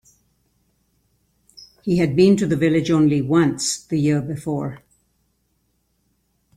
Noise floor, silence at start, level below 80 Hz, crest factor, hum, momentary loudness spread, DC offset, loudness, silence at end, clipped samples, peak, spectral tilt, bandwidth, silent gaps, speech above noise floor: -68 dBFS; 1.85 s; -54 dBFS; 18 dB; none; 10 LU; under 0.1%; -19 LUFS; 1.8 s; under 0.1%; -4 dBFS; -6 dB/octave; 14.5 kHz; none; 50 dB